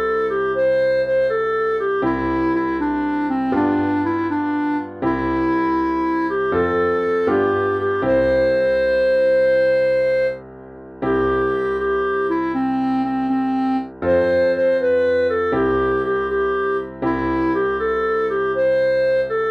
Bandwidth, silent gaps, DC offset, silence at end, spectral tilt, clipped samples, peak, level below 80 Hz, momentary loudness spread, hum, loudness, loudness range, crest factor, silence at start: 6 kHz; none; under 0.1%; 0 s; -8 dB/octave; under 0.1%; -8 dBFS; -42 dBFS; 4 LU; none; -19 LUFS; 3 LU; 10 dB; 0 s